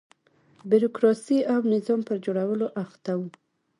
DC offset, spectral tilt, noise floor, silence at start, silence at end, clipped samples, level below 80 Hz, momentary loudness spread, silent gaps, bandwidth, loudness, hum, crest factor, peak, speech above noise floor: under 0.1%; -7.5 dB/octave; -61 dBFS; 0.65 s; 0.5 s; under 0.1%; -74 dBFS; 10 LU; none; 11 kHz; -25 LUFS; none; 18 dB; -8 dBFS; 37 dB